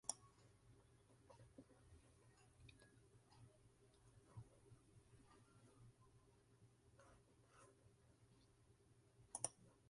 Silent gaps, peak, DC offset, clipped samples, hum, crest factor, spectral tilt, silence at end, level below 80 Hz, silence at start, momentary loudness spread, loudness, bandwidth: none; -26 dBFS; under 0.1%; under 0.1%; none; 38 dB; -2.5 dB/octave; 0 s; -80 dBFS; 0.05 s; 20 LU; -53 LUFS; 11.5 kHz